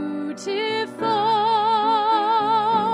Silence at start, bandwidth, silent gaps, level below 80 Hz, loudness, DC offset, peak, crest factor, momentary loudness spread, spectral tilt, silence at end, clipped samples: 0 s; 10.5 kHz; none; -70 dBFS; -21 LUFS; under 0.1%; -8 dBFS; 12 dB; 7 LU; -4.5 dB/octave; 0 s; under 0.1%